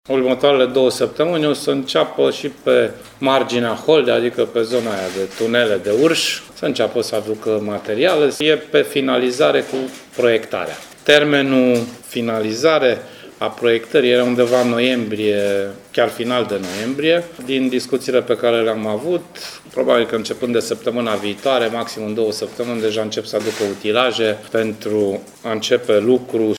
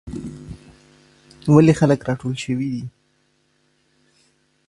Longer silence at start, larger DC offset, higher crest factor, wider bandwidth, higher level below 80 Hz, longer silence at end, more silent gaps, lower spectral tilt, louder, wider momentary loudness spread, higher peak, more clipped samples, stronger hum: about the same, 0.1 s vs 0.05 s; neither; about the same, 18 dB vs 22 dB; first, 17 kHz vs 11.5 kHz; second, -60 dBFS vs -50 dBFS; second, 0 s vs 1.8 s; neither; second, -4.5 dB/octave vs -7.5 dB/octave; about the same, -18 LUFS vs -18 LUFS; second, 8 LU vs 24 LU; about the same, 0 dBFS vs 0 dBFS; neither; neither